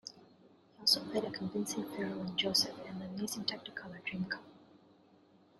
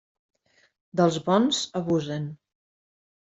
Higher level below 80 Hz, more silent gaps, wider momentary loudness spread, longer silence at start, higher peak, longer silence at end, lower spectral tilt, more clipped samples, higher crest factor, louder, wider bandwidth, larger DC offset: second, -74 dBFS vs -66 dBFS; neither; first, 14 LU vs 11 LU; second, 0.05 s vs 0.95 s; second, -14 dBFS vs -6 dBFS; about the same, 0.85 s vs 0.9 s; second, -3 dB/octave vs -5.5 dB/octave; neither; first, 26 dB vs 20 dB; second, -35 LUFS vs -25 LUFS; first, 13.5 kHz vs 8.2 kHz; neither